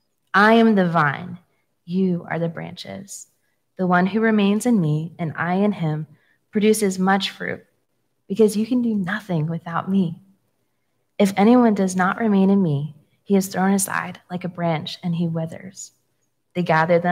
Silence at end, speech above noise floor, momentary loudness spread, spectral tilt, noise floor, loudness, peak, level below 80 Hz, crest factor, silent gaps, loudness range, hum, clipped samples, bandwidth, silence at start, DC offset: 0 s; 53 dB; 17 LU; -6 dB/octave; -73 dBFS; -20 LUFS; -2 dBFS; -70 dBFS; 18 dB; none; 5 LU; none; under 0.1%; 16 kHz; 0.35 s; under 0.1%